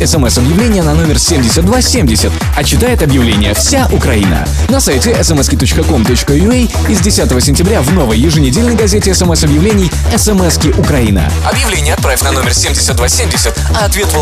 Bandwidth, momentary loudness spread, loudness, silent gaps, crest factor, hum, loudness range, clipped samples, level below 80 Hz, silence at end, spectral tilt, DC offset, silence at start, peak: 15.5 kHz; 2 LU; -9 LUFS; none; 8 dB; none; 1 LU; under 0.1%; -16 dBFS; 0 s; -4.5 dB/octave; 0.3%; 0 s; 0 dBFS